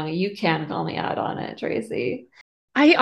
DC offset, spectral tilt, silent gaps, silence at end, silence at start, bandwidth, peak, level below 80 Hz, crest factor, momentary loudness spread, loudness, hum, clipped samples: under 0.1%; -6.5 dB/octave; 2.41-2.68 s; 0 s; 0 s; 10 kHz; -2 dBFS; -64 dBFS; 20 dB; 9 LU; -24 LUFS; none; under 0.1%